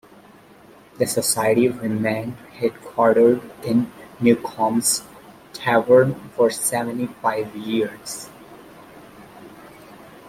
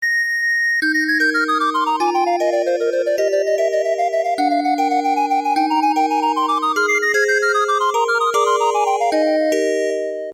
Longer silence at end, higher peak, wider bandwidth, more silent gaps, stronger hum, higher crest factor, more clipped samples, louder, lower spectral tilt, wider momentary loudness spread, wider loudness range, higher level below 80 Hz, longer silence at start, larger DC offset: first, 0.35 s vs 0 s; first, -2 dBFS vs -6 dBFS; second, 16 kHz vs 18 kHz; neither; neither; first, 20 dB vs 12 dB; neither; second, -20 LUFS vs -17 LUFS; first, -4.5 dB/octave vs -1 dB/octave; first, 12 LU vs 3 LU; first, 7 LU vs 2 LU; first, -60 dBFS vs -76 dBFS; first, 1 s vs 0 s; neither